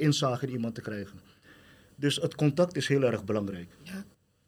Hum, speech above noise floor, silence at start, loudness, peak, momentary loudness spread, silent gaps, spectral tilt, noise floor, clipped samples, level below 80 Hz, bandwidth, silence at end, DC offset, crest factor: none; 27 dB; 0 s; -29 LUFS; -12 dBFS; 17 LU; none; -5.5 dB/octave; -56 dBFS; under 0.1%; -68 dBFS; 14.5 kHz; 0.45 s; under 0.1%; 18 dB